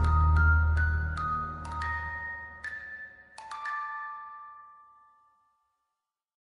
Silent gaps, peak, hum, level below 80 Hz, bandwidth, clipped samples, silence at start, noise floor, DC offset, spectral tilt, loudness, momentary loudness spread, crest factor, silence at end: none; -14 dBFS; none; -34 dBFS; 5.6 kHz; under 0.1%; 0 s; -86 dBFS; under 0.1%; -7 dB/octave; -30 LUFS; 21 LU; 16 dB; 1.85 s